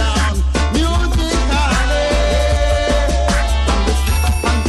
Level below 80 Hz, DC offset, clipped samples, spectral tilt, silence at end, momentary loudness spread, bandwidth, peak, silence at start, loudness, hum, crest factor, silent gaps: -16 dBFS; under 0.1%; under 0.1%; -5 dB/octave; 0 s; 1 LU; 13.5 kHz; -4 dBFS; 0 s; -16 LUFS; none; 12 dB; none